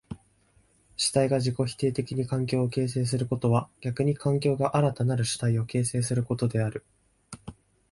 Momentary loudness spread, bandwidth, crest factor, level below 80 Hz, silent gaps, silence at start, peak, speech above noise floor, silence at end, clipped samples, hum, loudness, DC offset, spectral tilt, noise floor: 18 LU; 11.5 kHz; 18 dB; -56 dBFS; none; 0.1 s; -10 dBFS; 38 dB; 0.4 s; under 0.1%; none; -27 LUFS; under 0.1%; -6 dB/octave; -64 dBFS